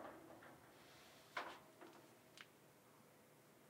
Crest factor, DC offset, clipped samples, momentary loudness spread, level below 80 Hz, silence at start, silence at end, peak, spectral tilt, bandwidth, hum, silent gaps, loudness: 30 dB; under 0.1%; under 0.1%; 16 LU; under -90 dBFS; 0 s; 0 s; -30 dBFS; -3 dB/octave; 16 kHz; none; none; -59 LUFS